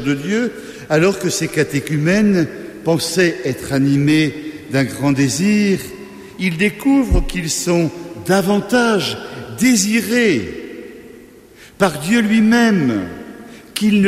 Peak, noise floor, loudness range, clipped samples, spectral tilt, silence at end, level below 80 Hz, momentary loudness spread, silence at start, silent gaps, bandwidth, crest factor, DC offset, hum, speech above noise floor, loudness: -2 dBFS; -42 dBFS; 1 LU; under 0.1%; -5 dB/octave; 0 s; -34 dBFS; 16 LU; 0 s; none; 15.5 kHz; 14 dB; under 0.1%; none; 27 dB; -16 LUFS